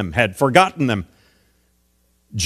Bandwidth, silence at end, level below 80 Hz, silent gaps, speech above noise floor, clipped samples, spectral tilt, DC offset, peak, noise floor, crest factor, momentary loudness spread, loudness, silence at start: 15 kHz; 0 s; -48 dBFS; none; 45 dB; under 0.1%; -4.5 dB/octave; under 0.1%; 0 dBFS; -62 dBFS; 20 dB; 18 LU; -17 LUFS; 0 s